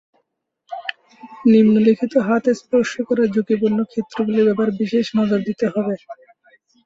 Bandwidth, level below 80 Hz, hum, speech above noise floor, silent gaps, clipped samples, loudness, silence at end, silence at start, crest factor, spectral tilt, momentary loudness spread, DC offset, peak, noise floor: 7.6 kHz; -60 dBFS; none; 55 dB; none; under 0.1%; -18 LUFS; 0.7 s; 0.7 s; 16 dB; -7 dB/octave; 14 LU; under 0.1%; -4 dBFS; -72 dBFS